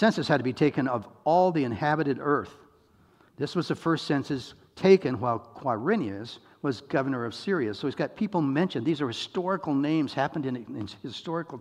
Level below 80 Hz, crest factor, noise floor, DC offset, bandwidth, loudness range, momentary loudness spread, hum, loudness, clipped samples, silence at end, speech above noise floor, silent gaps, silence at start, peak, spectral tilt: -68 dBFS; 22 dB; -61 dBFS; under 0.1%; 11 kHz; 3 LU; 12 LU; none; -28 LUFS; under 0.1%; 0 s; 34 dB; none; 0 s; -6 dBFS; -7 dB/octave